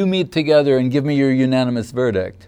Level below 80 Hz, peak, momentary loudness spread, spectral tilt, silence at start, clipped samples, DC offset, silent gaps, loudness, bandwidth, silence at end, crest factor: -54 dBFS; -2 dBFS; 6 LU; -7 dB/octave; 0 s; under 0.1%; under 0.1%; none; -17 LUFS; 11 kHz; 0.15 s; 14 dB